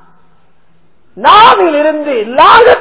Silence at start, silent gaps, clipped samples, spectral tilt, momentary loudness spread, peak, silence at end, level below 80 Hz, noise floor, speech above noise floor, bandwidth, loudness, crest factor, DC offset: 1.15 s; none; 9%; -7 dB/octave; 10 LU; 0 dBFS; 0 s; -42 dBFS; -53 dBFS; 47 dB; 4 kHz; -6 LUFS; 8 dB; 1%